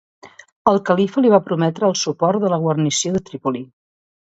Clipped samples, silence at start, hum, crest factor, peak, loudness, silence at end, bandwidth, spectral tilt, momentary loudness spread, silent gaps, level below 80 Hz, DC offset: under 0.1%; 0.25 s; none; 18 dB; 0 dBFS; -18 LUFS; 0.7 s; 8 kHz; -5 dB/octave; 9 LU; 0.52-0.65 s; -58 dBFS; under 0.1%